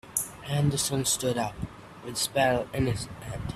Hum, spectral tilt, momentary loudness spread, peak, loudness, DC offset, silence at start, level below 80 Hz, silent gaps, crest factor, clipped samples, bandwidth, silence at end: none; -4 dB/octave; 12 LU; -10 dBFS; -28 LUFS; under 0.1%; 0.05 s; -48 dBFS; none; 20 dB; under 0.1%; 16 kHz; 0 s